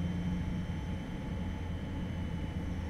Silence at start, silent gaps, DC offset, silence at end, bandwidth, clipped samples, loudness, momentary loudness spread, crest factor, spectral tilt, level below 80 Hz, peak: 0 s; none; under 0.1%; 0 s; 12 kHz; under 0.1%; -38 LUFS; 4 LU; 12 dB; -7.5 dB/octave; -44 dBFS; -24 dBFS